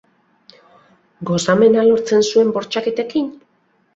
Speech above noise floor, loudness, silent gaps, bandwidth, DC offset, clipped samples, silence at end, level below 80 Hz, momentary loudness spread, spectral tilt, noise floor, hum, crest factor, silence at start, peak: 37 dB; -16 LUFS; none; 8 kHz; under 0.1%; under 0.1%; 0.6 s; -60 dBFS; 10 LU; -5 dB/octave; -52 dBFS; none; 16 dB; 1.2 s; -2 dBFS